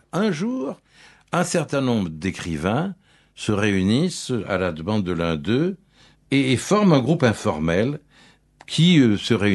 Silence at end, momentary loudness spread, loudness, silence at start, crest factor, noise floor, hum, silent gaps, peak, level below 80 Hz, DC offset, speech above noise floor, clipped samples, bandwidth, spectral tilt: 0 s; 10 LU; -21 LUFS; 0.15 s; 20 dB; -54 dBFS; none; none; -2 dBFS; -50 dBFS; under 0.1%; 34 dB; under 0.1%; 12 kHz; -6 dB/octave